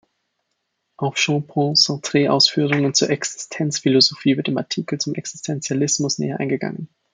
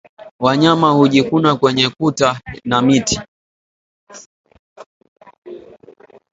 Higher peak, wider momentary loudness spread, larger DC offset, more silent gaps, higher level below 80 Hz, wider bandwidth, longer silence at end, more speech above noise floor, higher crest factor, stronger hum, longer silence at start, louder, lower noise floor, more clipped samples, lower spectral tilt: about the same, -2 dBFS vs 0 dBFS; second, 11 LU vs 20 LU; neither; second, none vs 0.31-0.39 s, 3.28-4.07 s, 4.26-4.44 s, 4.59-4.76 s, 4.86-5.01 s, 5.08-5.16 s, 5.38-5.42 s; second, -66 dBFS vs -48 dBFS; first, 9.6 kHz vs 8 kHz; second, 0.3 s vs 0.75 s; first, 55 dB vs 31 dB; about the same, 20 dB vs 18 dB; neither; first, 1 s vs 0.2 s; second, -19 LUFS vs -14 LUFS; first, -74 dBFS vs -44 dBFS; neither; second, -3.5 dB/octave vs -5 dB/octave